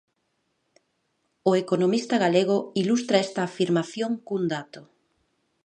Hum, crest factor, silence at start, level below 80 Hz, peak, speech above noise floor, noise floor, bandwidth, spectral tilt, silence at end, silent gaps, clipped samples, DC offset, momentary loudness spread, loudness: none; 18 dB; 1.45 s; -76 dBFS; -8 dBFS; 50 dB; -74 dBFS; 10 kHz; -5.5 dB/octave; 0.8 s; none; under 0.1%; under 0.1%; 7 LU; -24 LUFS